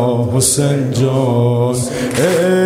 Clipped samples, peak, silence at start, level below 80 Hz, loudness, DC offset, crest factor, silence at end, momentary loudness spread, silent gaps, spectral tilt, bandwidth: under 0.1%; -2 dBFS; 0 s; -46 dBFS; -14 LUFS; under 0.1%; 12 dB; 0 s; 4 LU; none; -5 dB/octave; 16 kHz